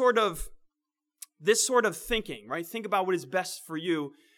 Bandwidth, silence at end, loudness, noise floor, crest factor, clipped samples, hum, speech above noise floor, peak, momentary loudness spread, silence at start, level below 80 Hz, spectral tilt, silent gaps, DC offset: 19 kHz; 0.3 s; -28 LUFS; -88 dBFS; 20 dB; under 0.1%; none; 59 dB; -10 dBFS; 15 LU; 0 s; -50 dBFS; -2.5 dB/octave; none; under 0.1%